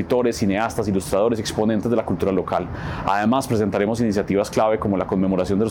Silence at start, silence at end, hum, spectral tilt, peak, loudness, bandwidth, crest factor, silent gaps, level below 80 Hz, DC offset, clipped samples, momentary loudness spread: 0 s; 0 s; none; -6.5 dB/octave; -6 dBFS; -21 LUFS; 18 kHz; 14 dB; none; -44 dBFS; under 0.1%; under 0.1%; 3 LU